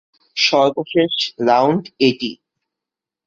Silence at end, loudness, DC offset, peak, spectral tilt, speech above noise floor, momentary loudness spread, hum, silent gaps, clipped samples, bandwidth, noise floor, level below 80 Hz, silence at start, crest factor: 0.95 s; -17 LUFS; under 0.1%; -2 dBFS; -4.5 dB/octave; 70 dB; 10 LU; none; none; under 0.1%; 7.8 kHz; -86 dBFS; -62 dBFS; 0.35 s; 16 dB